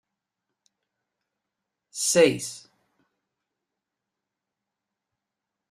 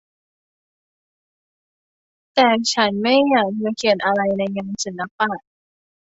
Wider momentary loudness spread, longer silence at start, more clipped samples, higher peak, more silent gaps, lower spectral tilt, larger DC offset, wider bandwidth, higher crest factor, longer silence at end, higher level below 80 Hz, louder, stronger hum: first, 21 LU vs 10 LU; second, 1.95 s vs 2.35 s; neither; second, -6 dBFS vs -2 dBFS; second, none vs 5.11-5.19 s; about the same, -3 dB/octave vs -3.5 dB/octave; neither; first, 14.5 kHz vs 8 kHz; about the same, 24 dB vs 20 dB; first, 3.1 s vs 0.75 s; second, -72 dBFS vs -64 dBFS; second, -22 LUFS vs -19 LUFS; neither